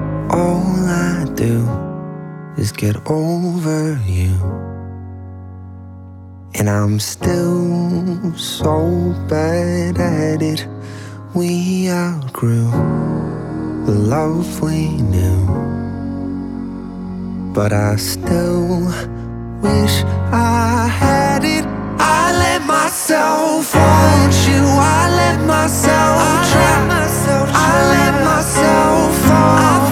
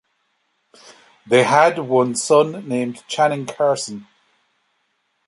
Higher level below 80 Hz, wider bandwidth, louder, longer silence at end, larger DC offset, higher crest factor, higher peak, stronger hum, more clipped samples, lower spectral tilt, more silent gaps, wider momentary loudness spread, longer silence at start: first, -34 dBFS vs -70 dBFS; first, 17 kHz vs 11.5 kHz; first, -15 LUFS vs -18 LUFS; second, 0 s vs 1.25 s; neither; about the same, 14 dB vs 18 dB; about the same, 0 dBFS vs -2 dBFS; neither; neither; first, -5.5 dB/octave vs -4 dB/octave; neither; first, 15 LU vs 10 LU; second, 0 s vs 1.25 s